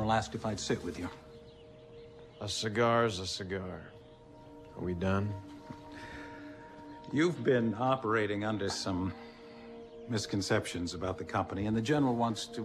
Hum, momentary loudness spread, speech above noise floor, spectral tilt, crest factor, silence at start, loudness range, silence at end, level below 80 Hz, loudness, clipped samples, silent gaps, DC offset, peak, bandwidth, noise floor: none; 22 LU; 21 dB; -5 dB/octave; 18 dB; 0 s; 6 LU; 0 s; -60 dBFS; -33 LUFS; under 0.1%; none; under 0.1%; -16 dBFS; 14 kHz; -54 dBFS